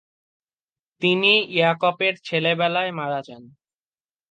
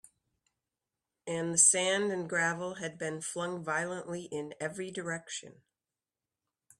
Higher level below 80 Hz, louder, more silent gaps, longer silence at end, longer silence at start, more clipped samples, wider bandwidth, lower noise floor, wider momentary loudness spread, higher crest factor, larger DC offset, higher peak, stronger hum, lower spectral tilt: about the same, -76 dBFS vs -78 dBFS; first, -20 LUFS vs -31 LUFS; neither; second, 0.85 s vs 1.3 s; second, 1 s vs 1.25 s; neither; second, 9 kHz vs 15 kHz; about the same, under -90 dBFS vs under -90 dBFS; second, 10 LU vs 17 LU; second, 20 dB vs 26 dB; neither; first, -4 dBFS vs -8 dBFS; neither; first, -6 dB/octave vs -2 dB/octave